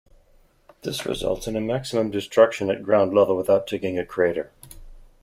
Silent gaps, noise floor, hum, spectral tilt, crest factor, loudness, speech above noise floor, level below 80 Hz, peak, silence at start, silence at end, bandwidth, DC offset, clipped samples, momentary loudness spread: none; -57 dBFS; none; -5.5 dB/octave; 20 dB; -22 LUFS; 35 dB; -48 dBFS; -4 dBFS; 0.85 s; 0.2 s; 15.5 kHz; under 0.1%; under 0.1%; 11 LU